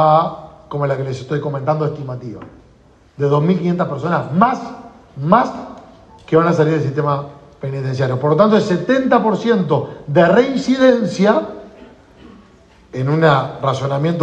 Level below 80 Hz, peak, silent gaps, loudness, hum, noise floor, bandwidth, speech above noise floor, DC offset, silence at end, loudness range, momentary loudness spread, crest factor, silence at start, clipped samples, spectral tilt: -52 dBFS; 0 dBFS; none; -16 LUFS; none; -49 dBFS; 8.6 kHz; 33 dB; under 0.1%; 0 s; 5 LU; 17 LU; 16 dB; 0 s; under 0.1%; -7.5 dB/octave